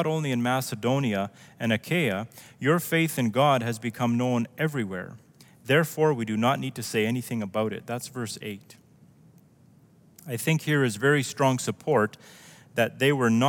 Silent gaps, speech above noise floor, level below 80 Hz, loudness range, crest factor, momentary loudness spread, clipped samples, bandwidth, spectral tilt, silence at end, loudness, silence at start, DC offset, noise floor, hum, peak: none; 31 dB; -72 dBFS; 6 LU; 18 dB; 11 LU; under 0.1%; 18 kHz; -5.5 dB/octave; 0 s; -26 LUFS; 0 s; under 0.1%; -57 dBFS; none; -8 dBFS